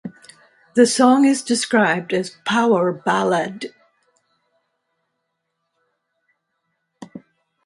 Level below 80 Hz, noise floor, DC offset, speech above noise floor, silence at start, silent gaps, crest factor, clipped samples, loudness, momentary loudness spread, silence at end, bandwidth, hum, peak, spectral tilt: -70 dBFS; -75 dBFS; under 0.1%; 58 dB; 0.05 s; none; 20 dB; under 0.1%; -18 LUFS; 22 LU; 0.45 s; 11.5 kHz; none; 0 dBFS; -4 dB/octave